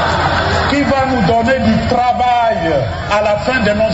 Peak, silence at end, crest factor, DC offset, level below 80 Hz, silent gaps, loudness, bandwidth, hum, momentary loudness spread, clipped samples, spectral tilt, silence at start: -2 dBFS; 0 s; 12 dB; under 0.1%; -32 dBFS; none; -13 LUFS; 8 kHz; none; 3 LU; under 0.1%; -6 dB/octave; 0 s